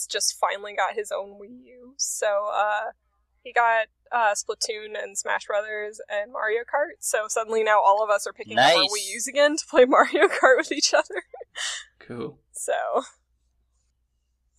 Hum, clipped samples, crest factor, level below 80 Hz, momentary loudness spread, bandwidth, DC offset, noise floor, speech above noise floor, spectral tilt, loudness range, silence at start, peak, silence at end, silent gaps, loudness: none; under 0.1%; 22 dB; -68 dBFS; 15 LU; 15.5 kHz; under 0.1%; -72 dBFS; 48 dB; -1 dB/octave; 8 LU; 0 s; -2 dBFS; 1.5 s; none; -23 LUFS